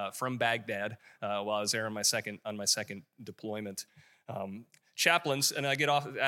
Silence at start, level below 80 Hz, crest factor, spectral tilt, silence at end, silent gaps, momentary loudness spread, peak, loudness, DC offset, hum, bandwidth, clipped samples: 0 s; -82 dBFS; 24 dB; -2 dB/octave; 0 s; none; 17 LU; -8 dBFS; -31 LUFS; under 0.1%; none; 16.5 kHz; under 0.1%